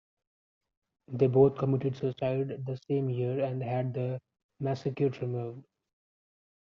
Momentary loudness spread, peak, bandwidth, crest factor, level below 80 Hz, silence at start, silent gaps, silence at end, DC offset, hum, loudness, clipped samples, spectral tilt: 13 LU; -10 dBFS; 6.6 kHz; 22 dB; -68 dBFS; 1.1 s; 4.44-4.49 s; 1.1 s; under 0.1%; none; -30 LUFS; under 0.1%; -8.5 dB/octave